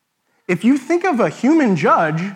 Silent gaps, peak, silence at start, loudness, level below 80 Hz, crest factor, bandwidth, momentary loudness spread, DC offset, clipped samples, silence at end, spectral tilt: none; -2 dBFS; 0.5 s; -16 LUFS; -74 dBFS; 14 dB; 11.5 kHz; 5 LU; under 0.1%; under 0.1%; 0 s; -7 dB/octave